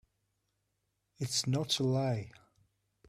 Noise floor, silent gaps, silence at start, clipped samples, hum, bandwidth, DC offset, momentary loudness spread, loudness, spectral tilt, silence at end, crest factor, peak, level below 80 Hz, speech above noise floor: -82 dBFS; none; 1.2 s; under 0.1%; none; 14.5 kHz; under 0.1%; 11 LU; -33 LUFS; -4.5 dB/octave; 0.8 s; 18 dB; -18 dBFS; -70 dBFS; 49 dB